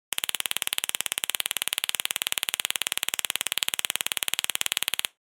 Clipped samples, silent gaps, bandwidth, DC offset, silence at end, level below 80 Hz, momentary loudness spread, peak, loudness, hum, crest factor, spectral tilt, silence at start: under 0.1%; none; over 20 kHz; under 0.1%; 0.15 s; -84 dBFS; 1 LU; -2 dBFS; -27 LUFS; none; 28 dB; 2.5 dB/octave; 0.2 s